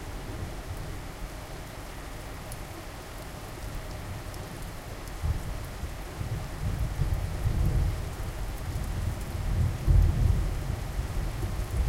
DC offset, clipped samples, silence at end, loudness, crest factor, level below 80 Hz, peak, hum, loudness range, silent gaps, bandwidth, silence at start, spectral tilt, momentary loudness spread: under 0.1%; under 0.1%; 0 s; -33 LUFS; 20 dB; -32 dBFS; -10 dBFS; none; 10 LU; none; 16.5 kHz; 0 s; -6 dB/octave; 13 LU